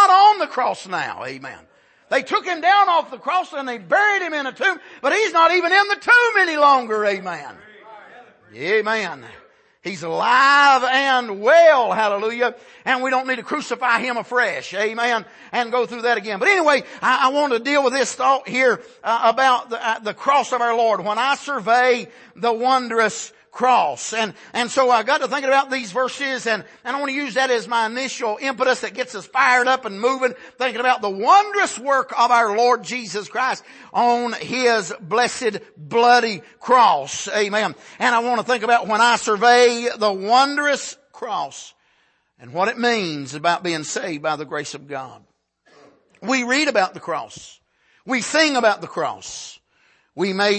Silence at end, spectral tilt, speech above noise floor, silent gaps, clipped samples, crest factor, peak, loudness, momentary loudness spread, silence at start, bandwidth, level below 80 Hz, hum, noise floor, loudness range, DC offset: 0 s; -2.5 dB/octave; 44 dB; none; under 0.1%; 16 dB; -2 dBFS; -18 LUFS; 13 LU; 0 s; 8.8 kHz; -72 dBFS; none; -63 dBFS; 7 LU; under 0.1%